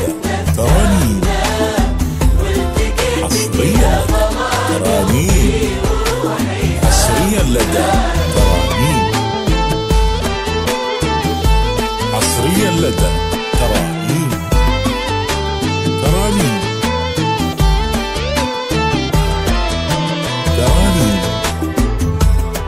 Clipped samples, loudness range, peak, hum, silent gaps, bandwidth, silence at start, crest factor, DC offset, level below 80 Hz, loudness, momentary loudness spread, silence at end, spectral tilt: under 0.1%; 2 LU; 0 dBFS; none; none; 16 kHz; 0 s; 14 dB; under 0.1%; -18 dBFS; -15 LUFS; 4 LU; 0 s; -5 dB/octave